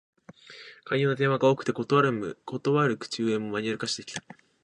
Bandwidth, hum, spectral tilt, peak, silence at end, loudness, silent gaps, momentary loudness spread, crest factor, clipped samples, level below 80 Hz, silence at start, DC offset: 10.5 kHz; none; -5.5 dB/octave; -8 dBFS; 0.45 s; -27 LUFS; none; 16 LU; 20 dB; under 0.1%; -70 dBFS; 0.5 s; under 0.1%